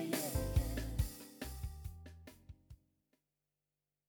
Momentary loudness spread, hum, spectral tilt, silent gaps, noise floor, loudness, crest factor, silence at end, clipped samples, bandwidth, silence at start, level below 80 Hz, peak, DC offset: 22 LU; 50 Hz at -65 dBFS; -5 dB/octave; none; under -90 dBFS; -41 LUFS; 20 dB; 1.35 s; under 0.1%; over 20 kHz; 0 s; -46 dBFS; -22 dBFS; under 0.1%